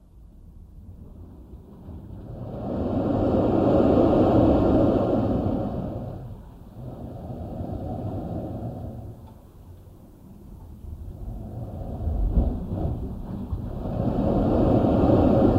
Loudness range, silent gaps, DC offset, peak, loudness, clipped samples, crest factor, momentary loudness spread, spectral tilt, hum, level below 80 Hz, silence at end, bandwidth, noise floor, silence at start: 16 LU; none; under 0.1%; -8 dBFS; -24 LUFS; under 0.1%; 18 dB; 25 LU; -10.5 dB/octave; none; -34 dBFS; 0 s; 15 kHz; -47 dBFS; 0.15 s